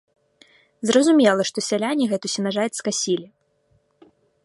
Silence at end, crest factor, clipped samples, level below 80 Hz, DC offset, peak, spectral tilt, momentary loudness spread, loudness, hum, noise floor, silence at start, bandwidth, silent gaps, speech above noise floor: 1.2 s; 20 dB; under 0.1%; -72 dBFS; under 0.1%; -4 dBFS; -3.5 dB/octave; 8 LU; -21 LUFS; none; -64 dBFS; 0.8 s; 11.5 kHz; none; 44 dB